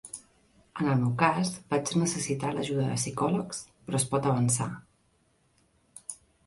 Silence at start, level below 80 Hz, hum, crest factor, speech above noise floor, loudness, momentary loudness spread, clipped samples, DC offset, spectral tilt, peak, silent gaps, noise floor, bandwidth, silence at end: 0.05 s; -62 dBFS; none; 22 dB; 41 dB; -28 LUFS; 17 LU; under 0.1%; under 0.1%; -5 dB/octave; -8 dBFS; none; -69 dBFS; 11.5 kHz; 0.3 s